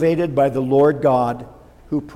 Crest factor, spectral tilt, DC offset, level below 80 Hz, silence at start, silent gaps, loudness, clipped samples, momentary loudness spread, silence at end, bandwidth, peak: 14 dB; -8.5 dB/octave; under 0.1%; -48 dBFS; 0 s; none; -18 LUFS; under 0.1%; 11 LU; 0 s; 13 kHz; -4 dBFS